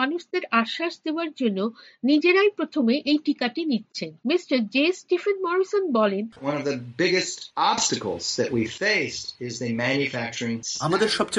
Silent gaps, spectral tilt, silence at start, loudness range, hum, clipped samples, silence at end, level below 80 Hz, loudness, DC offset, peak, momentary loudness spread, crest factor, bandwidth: none; -3.5 dB/octave; 0 s; 2 LU; none; under 0.1%; 0 s; -66 dBFS; -24 LUFS; under 0.1%; -6 dBFS; 8 LU; 18 dB; 11.5 kHz